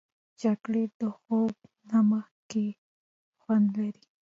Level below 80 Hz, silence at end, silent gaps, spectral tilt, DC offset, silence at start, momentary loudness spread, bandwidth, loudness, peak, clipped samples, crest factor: -76 dBFS; 0.3 s; 0.94-1.00 s, 2.31-2.50 s, 2.78-3.33 s; -8 dB/octave; under 0.1%; 0.4 s; 10 LU; 7.4 kHz; -29 LUFS; -16 dBFS; under 0.1%; 14 dB